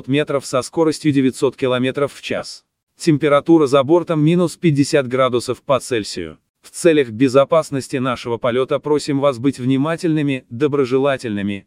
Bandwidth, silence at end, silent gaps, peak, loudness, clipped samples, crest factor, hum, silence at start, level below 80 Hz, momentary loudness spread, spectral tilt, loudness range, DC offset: 14.5 kHz; 0.05 s; 2.83-2.87 s, 6.49-6.54 s; 0 dBFS; -17 LUFS; under 0.1%; 16 dB; none; 0.05 s; -58 dBFS; 8 LU; -6 dB/octave; 3 LU; under 0.1%